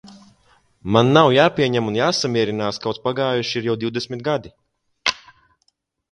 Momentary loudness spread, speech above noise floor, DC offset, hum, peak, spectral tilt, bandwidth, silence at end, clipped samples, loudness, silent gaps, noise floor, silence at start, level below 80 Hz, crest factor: 11 LU; 49 dB; under 0.1%; none; 0 dBFS; -5 dB/octave; 11 kHz; 0.95 s; under 0.1%; -19 LUFS; none; -68 dBFS; 0.05 s; -54 dBFS; 20 dB